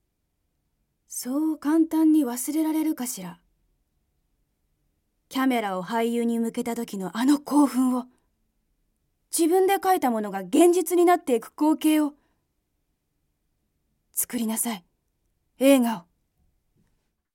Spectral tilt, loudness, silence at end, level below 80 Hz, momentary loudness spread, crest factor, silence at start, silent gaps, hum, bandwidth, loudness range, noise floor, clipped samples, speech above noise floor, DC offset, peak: -4 dB/octave; -24 LUFS; 1.35 s; -72 dBFS; 11 LU; 20 dB; 1.1 s; none; none; 17 kHz; 8 LU; -75 dBFS; under 0.1%; 53 dB; under 0.1%; -6 dBFS